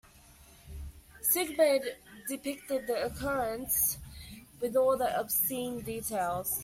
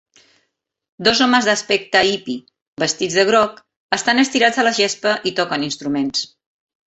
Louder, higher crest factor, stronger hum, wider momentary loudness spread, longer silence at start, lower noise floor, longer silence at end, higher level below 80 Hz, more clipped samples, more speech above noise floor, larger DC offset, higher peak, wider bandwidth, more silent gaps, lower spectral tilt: second, -31 LUFS vs -17 LUFS; about the same, 20 dB vs 18 dB; neither; first, 20 LU vs 9 LU; second, 0.15 s vs 1 s; second, -57 dBFS vs -72 dBFS; second, 0 s vs 0.6 s; first, -54 dBFS vs -60 dBFS; neither; second, 26 dB vs 54 dB; neither; second, -14 dBFS vs 0 dBFS; first, 16 kHz vs 8.4 kHz; second, none vs 2.62-2.77 s, 3.76-3.89 s; about the same, -3 dB/octave vs -2.5 dB/octave